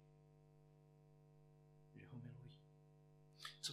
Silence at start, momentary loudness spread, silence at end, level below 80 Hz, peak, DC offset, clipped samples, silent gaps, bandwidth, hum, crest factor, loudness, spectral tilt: 0 s; 13 LU; 0 s; -82 dBFS; -34 dBFS; under 0.1%; under 0.1%; none; 12.5 kHz; 50 Hz at -65 dBFS; 26 dB; -60 LUFS; -3 dB/octave